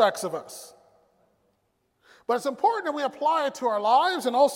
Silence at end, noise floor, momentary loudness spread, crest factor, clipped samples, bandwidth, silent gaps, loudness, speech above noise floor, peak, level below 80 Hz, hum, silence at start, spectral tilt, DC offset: 0 s; -72 dBFS; 15 LU; 20 dB; under 0.1%; 16.5 kHz; none; -25 LUFS; 48 dB; -6 dBFS; -80 dBFS; none; 0 s; -3 dB/octave; under 0.1%